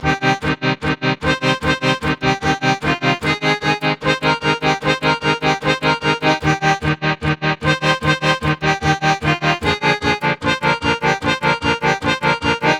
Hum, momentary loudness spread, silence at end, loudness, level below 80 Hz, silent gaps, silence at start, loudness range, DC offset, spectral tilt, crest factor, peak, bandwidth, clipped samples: none; 2 LU; 0 s; -17 LUFS; -38 dBFS; none; 0 s; 1 LU; under 0.1%; -5 dB/octave; 16 dB; 0 dBFS; 13.5 kHz; under 0.1%